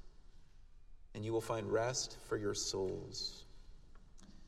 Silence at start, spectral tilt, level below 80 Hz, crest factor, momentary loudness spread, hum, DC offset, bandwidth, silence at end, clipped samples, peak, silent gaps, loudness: 0 s; -3.5 dB/octave; -58 dBFS; 20 dB; 9 LU; none; under 0.1%; 15 kHz; 0 s; under 0.1%; -22 dBFS; none; -39 LUFS